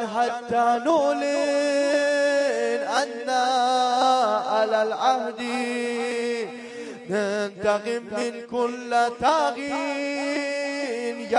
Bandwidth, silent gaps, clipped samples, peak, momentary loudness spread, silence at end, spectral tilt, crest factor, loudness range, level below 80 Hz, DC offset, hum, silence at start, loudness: 11.5 kHz; none; under 0.1%; -8 dBFS; 7 LU; 0 s; -3 dB/octave; 16 dB; 5 LU; -66 dBFS; under 0.1%; none; 0 s; -24 LUFS